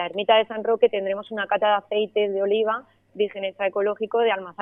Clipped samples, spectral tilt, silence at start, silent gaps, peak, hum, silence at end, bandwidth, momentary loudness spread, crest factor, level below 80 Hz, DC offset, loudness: under 0.1%; -7 dB/octave; 0 s; none; -4 dBFS; none; 0 s; 3.8 kHz; 8 LU; 18 dB; -74 dBFS; under 0.1%; -23 LUFS